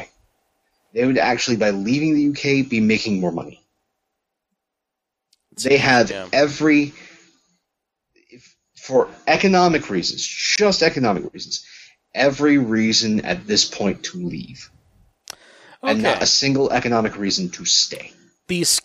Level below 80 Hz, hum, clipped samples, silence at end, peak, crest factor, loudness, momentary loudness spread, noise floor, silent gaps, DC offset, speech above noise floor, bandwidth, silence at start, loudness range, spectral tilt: -54 dBFS; none; under 0.1%; 0.05 s; -2 dBFS; 20 dB; -18 LUFS; 14 LU; -82 dBFS; none; under 0.1%; 63 dB; 15.5 kHz; 0 s; 4 LU; -3.5 dB/octave